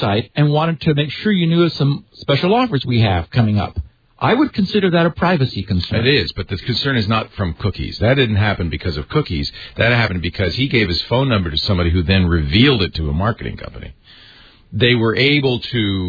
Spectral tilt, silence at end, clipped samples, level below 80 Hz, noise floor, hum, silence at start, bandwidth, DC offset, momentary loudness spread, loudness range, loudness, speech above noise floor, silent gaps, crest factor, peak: -8 dB/octave; 0 s; under 0.1%; -34 dBFS; -45 dBFS; none; 0 s; 5 kHz; under 0.1%; 9 LU; 2 LU; -17 LUFS; 29 dB; none; 16 dB; 0 dBFS